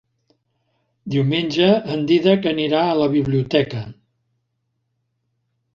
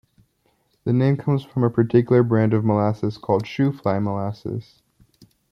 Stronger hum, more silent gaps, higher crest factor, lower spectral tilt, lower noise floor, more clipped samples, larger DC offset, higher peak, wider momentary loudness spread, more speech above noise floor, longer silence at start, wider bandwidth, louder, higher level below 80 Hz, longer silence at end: neither; neither; about the same, 18 dB vs 18 dB; second, -7.5 dB/octave vs -9.5 dB/octave; first, -72 dBFS vs -66 dBFS; neither; neither; about the same, -2 dBFS vs -4 dBFS; about the same, 10 LU vs 11 LU; first, 55 dB vs 46 dB; first, 1.05 s vs 0.85 s; first, 7.4 kHz vs 6.4 kHz; first, -18 LUFS vs -21 LUFS; about the same, -56 dBFS vs -60 dBFS; first, 1.8 s vs 0.9 s